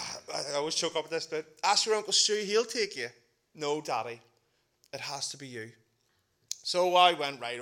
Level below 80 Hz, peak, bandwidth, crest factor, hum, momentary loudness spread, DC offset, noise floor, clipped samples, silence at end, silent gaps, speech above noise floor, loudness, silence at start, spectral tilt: -82 dBFS; -8 dBFS; 17 kHz; 24 dB; none; 17 LU; under 0.1%; -74 dBFS; under 0.1%; 0 s; none; 44 dB; -29 LUFS; 0 s; -1.5 dB/octave